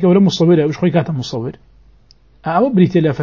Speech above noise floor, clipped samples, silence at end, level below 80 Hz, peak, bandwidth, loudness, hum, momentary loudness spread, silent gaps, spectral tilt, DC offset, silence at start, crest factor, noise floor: 36 dB; under 0.1%; 0 s; -50 dBFS; 0 dBFS; 7.2 kHz; -14 LUFS; none; 13 LU; none; -7.5 dB/octave; 0.2%; 0 s; 14 dB; -49 dBFS